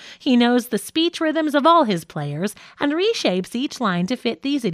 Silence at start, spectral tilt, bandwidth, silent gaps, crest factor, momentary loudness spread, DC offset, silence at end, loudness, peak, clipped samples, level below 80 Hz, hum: 0 s; -5 dB/octave; 15.5 kHz; none; 18 dB; 10 LU; under 0.1%; 0 s; -20 LUFS; -2 dBFS; under 0.1%; -66 dBFS; none